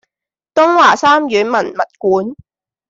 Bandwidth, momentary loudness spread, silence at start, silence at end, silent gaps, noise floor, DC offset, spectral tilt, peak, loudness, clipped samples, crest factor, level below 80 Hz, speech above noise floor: 7.8 kHz; 10 LU; 0.55 s; 0.55 s; none; -86 dBFS; under 0.1%; -4 dB/octave; 0 dBFS; -12 LUFS; under 0.1%; 14 dB; -60 dBFS; 73 dB